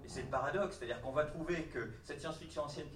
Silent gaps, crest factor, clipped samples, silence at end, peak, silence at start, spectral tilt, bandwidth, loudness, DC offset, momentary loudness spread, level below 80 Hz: none; 18 dB; under 0.1%; 0 s; -22 dBFS; 0 s; -5.5 dB/octave; 13.5 kHz; -40 LUFS; under 0.1%; 7 LU; -58 dBFS